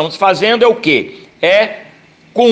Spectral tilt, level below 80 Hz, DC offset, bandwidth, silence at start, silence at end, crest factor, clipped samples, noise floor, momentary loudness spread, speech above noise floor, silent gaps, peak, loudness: -4.5 dB/octave; -58 dBFS; under 0.1%; 9 kHz; 0 s; 0 s; 12 dB; under 0.1%; -43 dBFS; 12 LU; 31 dB; none; 0 dBFS; -12 LUFS